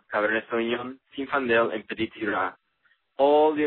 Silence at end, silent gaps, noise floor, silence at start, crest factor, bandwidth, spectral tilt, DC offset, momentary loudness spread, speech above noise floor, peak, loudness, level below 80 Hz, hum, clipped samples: 0 s; none; -68 dBFS; 0.1 s; 16 dB; 4.3 kHz; -8.5 dB/octave; under 0.1%; 11 LU; 44 dB; -10 dBFS; -25 LUFS; -66 dBFS; none; under 0.1%